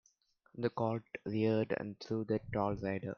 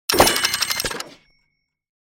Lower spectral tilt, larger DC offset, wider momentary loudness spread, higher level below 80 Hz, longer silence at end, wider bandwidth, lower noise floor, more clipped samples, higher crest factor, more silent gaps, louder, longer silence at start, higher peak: first, -8.5 dB/octave vs -1.5 dB/octave; neither; second, 7 LU vs 16 LU; second, -64 dBFS vs -44 dBFS; second, 0.05 s vs 1 s; second, 6.8 kHz vs 17 kHz; about the same, -73 dBFS vs -71 dBFS; neither; about the same, 18 dB vs 22 dB; neither; second, -37 LUFS vs -18 LUFS; first, 0.55 s vs 0.1 s; second, -20 dBFS vs 0 dBFS